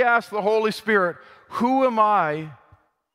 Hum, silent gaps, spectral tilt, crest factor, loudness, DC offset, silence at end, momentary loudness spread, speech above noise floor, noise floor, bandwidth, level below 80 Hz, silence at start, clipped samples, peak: none; none; -5.5 dB/octave; 16 dB; -21 LUFS; under 0.1%; 0.6 s; 14 LU; 37 dB; -58 dBFS; 15.5 kHz; -68 dBFS; 0 s; under 0.1%; -6 dBFS